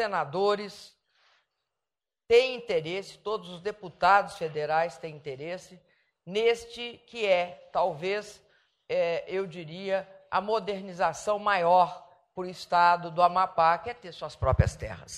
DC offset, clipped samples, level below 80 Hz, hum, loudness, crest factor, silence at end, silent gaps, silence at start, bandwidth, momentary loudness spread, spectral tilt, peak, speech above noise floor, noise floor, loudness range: under 0.1%; under 0.1%; -48 dBFS; none; -28 LUFS; 22 dB; 0 s; none; 0 s; 12.5 kHz; 16 LU; -5 dB/octave; -8 dBFS; over 62 dB; under -90 dBFS; 5 LU